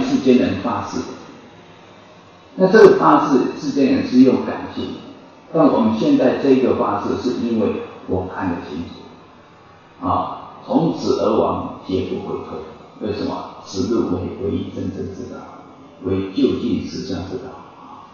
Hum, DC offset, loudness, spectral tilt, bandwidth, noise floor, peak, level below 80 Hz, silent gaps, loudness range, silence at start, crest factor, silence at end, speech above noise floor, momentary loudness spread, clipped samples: none; under 0.1%; -18 LUFS; -7 dB/octave; 7.2 kHz; -46 dBFS; 0 dBFS; -58 dBFS; none; 10 LU; 0 s; 18 dB; 0.05 s; 28 dB; 19 LU; under 0.1%